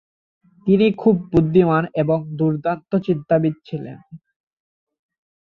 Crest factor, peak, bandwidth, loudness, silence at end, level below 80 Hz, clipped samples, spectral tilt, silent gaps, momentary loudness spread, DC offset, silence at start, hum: 16 dB; -4 dBFS; 5.4 kHz; -19 LUFS; 1.25 s; -48 dBFS; under 0.1%; -10 dB/octave; none; 13 LU; under 0.1%; 0.65 s; none